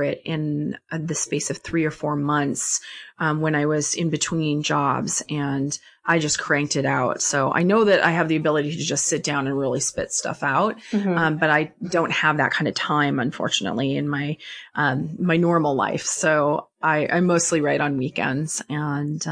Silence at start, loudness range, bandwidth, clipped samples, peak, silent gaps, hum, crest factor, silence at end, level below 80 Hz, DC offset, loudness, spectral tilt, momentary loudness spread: 0 s; 3 LU; 10.5 kHz; under 0.1%; -4 dBFS; none; none; 18 dB; 0 s; -60 dBFS; under 0.1%; -22 LUFS; -4 dB/octave; 7 LU